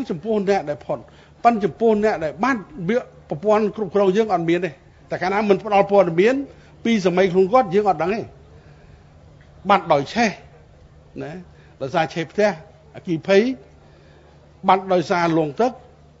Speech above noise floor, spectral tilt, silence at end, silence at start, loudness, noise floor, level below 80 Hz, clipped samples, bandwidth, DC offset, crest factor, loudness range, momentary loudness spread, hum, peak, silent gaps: 29 dB; -6.5 dB/octave; 0.45 s; 0 s; -20 LUFS; -48 dBFS; -54 dBFS; under 0.1%; 7.8 kHz; under 0.1%; 20 dB; 5 LU; 15 LU; none; 0 dBFS; none